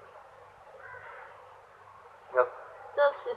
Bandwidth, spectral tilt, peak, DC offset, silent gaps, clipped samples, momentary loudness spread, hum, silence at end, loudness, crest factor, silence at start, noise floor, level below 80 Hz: 5.6 kHz; -4.5 dB/octave; -10 dBFS; under 0.1%; none; under 0.1%; 25 LU; none; 0 s; -30 LUFS; 24 dB; 0.15 s; -54 dBFS; -76 dBFS